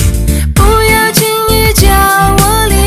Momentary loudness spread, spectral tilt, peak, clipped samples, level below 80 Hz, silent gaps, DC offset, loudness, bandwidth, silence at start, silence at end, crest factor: 4 LU; -4 dB/octave; 0 dBFS; 1%; -14 dBFS; none; under 0.1%; -8 LUFS; 16 kHz; 0 s; 0 s; 8 dB